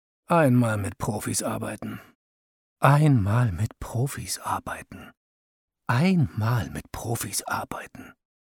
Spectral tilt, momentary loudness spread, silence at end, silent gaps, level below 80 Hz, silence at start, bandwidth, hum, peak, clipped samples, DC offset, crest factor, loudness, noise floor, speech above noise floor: -6 dB/octave; 18 LU; 0.45 s; 2.15-2.76 s, 5.17-5.68 s; -52 dBFS; 0.3 s; 19 kHz; none; -4 dBFS; under 0.1%; under 0.1%; 22 dB; -25 LUFS; under -90 dBFS; over 65 dB